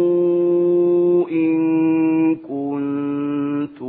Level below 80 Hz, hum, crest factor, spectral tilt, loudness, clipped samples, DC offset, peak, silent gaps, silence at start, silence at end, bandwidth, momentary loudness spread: -68 dBFS; none; 10 dB; -13 dB/octave; -18 LUFS; under 0.1%; under 0.1%; -8 dBFS; none; 0 s; 0 s; 3.8 kHz; 7 LU